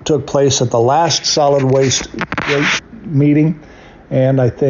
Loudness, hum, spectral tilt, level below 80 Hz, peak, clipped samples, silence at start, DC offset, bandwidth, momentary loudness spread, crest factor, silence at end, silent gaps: -14 LUFS; none; -4.5 dB/octave; -44 dBFS; -4 dBFS; under 0.1%; 0 s; under 0.1%; 7.6 kHz; 7 LU; 10 dB; 0 s; none